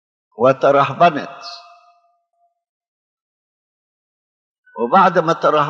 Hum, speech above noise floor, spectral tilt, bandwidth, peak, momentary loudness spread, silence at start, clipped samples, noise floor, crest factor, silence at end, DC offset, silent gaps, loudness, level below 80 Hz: none; 51 dB; -6.5 dB/octave; 7.4 kHz; -2 dBFS; 20 LU; 0.4 s; under 0.1%; -65 dBFS; 18 dB; 0 s; under 0.1%; 2.69-2.81 s, 2.88-4.63 s; -15 LUFS; -76 dBFS